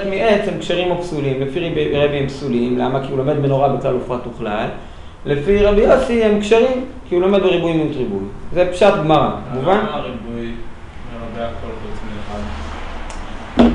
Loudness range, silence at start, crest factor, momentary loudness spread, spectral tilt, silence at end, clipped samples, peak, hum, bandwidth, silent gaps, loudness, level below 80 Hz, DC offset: 8 LU; 0 s; 16 dB; 17 LU; -7 dB/octave; 0 s; under 0.1%; 0 dBFS; none; 11 kHz; none; -17 LUFS; -32 dBFS; under 0.1%